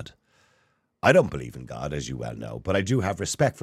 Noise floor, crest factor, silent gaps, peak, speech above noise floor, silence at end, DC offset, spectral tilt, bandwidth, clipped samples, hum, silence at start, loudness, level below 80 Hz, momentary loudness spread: -68 dBFS; 22 dB; none; -4 dBFS; 43 dB; 0 s; under 0.1%; -5.5 dB/octave; 14.5 kHz; under 0.1%; none; 0 s; -25 LUFS; -50 dBFS; 16 LU